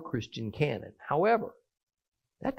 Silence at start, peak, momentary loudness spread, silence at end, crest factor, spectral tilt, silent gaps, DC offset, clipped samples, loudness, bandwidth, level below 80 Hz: 0 s; -14 dBFS; 13 LU; 0 s; 18 dB; -7 dB/octave; 1.83-1.87 s, 2.08-2.12 s; under 0.1%; under 0.1%; -31 LUFS; 14 kHz; -64 dBFS